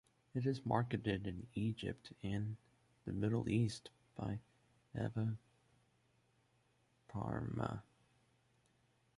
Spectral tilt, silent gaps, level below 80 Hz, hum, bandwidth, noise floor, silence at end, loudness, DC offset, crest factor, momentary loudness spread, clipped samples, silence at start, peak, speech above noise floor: -7.5 dB/octave; none; -64 dBFS; none; 11.5 kHz; -76 dBFS; 1.35 s; -42 LUFS; under 0.1%; 22 dB; 14 LU; under 0.1%; 0.35 s; -20 dBFS; 36 dB